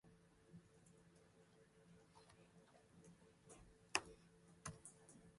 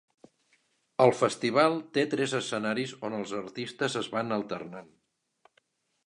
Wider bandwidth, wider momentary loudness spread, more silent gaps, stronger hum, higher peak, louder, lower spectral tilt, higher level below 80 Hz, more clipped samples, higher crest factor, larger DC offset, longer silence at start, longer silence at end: about the same, 11.5 kHz vs 11.5 kHz; first, 24 LU vs 14 LU; neither; neither; second, -18 dBFS vs -6 dBFS; second, -50 LUFS vs -29 LUFS; second, -2 dB/octave vs -4.5 dB/octave; about the same, -78 dBFS vs -76 dBFS; neither; first, 42 dB vs 24 dB; neither; second, 0.05 s vs 1 s; second, 0 s vs 1.25 s